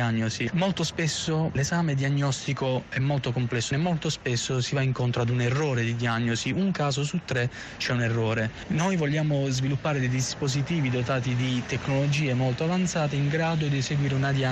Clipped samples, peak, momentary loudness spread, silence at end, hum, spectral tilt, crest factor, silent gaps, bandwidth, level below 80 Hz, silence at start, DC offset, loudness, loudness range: under 0.1%; -16 dBFS; 3 LU; 0 s; none; -5.5 dB/octave; 10 dB; none; 9.2 kHz; -52 dBFS; 0 s; under 0.1%; -26 LUFS; 1 LU